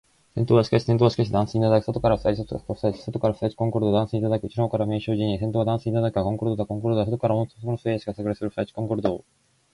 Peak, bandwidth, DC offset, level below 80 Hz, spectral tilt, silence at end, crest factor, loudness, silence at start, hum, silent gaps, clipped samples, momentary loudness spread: -6 dBFS; 11 kHz; under 0.1%; -48 dBFS; -8.5 dB/octave; 0.55 s; 18 dB; -24 LUFS; 0.35 s; none; none; under 0.1%; 8 LU